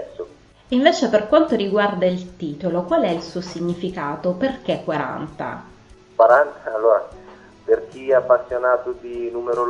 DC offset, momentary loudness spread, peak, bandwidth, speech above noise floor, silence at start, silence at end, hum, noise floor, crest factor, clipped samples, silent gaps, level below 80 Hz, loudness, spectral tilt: under 0.1%; 14 LU; 0 dBFS; 8 kHz; 24 dB; 0 s; 0 s; none; -44 dBFS; 20 dB; under 0.1%; none; -54 dBFS; -20 LUFS; -6 dB/octave